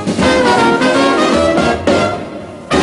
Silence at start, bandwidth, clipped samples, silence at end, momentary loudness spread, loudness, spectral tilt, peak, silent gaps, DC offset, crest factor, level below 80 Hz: 0 s; 11.5 kHz; under 0.1%; 0 s; 11 LU; -12 LUFS; -4.5 dB/octave; 0 dBFS; none; under 0.1%; 12 dB; -36 dBFS